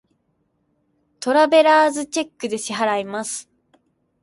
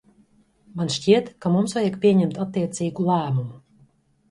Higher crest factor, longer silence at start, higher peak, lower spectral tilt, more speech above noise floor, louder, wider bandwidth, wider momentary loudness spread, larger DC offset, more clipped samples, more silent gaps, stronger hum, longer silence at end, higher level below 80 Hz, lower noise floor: about the same, 18 dB vs 20 dB; first, 1.2 s vs 0.75 s; about the same, -4 dBFS vs -4 dBFS; second, -2.5 dB/octave vs -6.5 dB/octave; first, 50 dB vs 38 dB; first, -19 LUFS vs -22 LUFS; about the same, 11.5 kHz vs 11.5 kHz; first, 15 LU vs 9 LU; neither; neither; neither; neither; about the same, 0.8 s vs 0.7 s; second, -72 dBFS vs -62 dBFS; first, -68 dBFS vs -59 dBFS